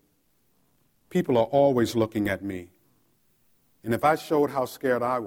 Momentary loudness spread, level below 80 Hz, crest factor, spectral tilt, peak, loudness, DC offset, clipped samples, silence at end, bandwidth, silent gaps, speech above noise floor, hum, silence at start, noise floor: 11 LU; -62 dBFS; 18 dB; -6.5 dB/octave; -8 dBFS; -25 LUFS; under 0.1%; under 0.1%; 0 s; 17 kHz; none; 45 dB; none; 1.1 s; -69 dBFS